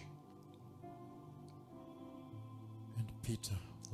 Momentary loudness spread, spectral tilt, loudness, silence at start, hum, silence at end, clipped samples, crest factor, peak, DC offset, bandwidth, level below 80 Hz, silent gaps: 14 LU; -5.5 dB/octave; -49 LUFS; 0 s; none; 0 s; under 0.1%; 18 dB; -30 dBFS; under 0.1%; 15 kHz; -66 dBFS; none